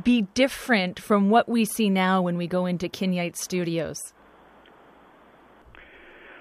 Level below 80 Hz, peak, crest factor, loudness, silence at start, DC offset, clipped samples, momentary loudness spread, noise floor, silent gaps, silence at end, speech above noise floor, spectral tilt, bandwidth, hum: -58 dBFS; -8 dBFS; 18 dB; -24 LUFS; 0 s; under 0.1%; under 0.1%; 8 LU; -53 dBFS; none; 0 s; 30 dB; -5 dB/octave; 15.5 kHz; none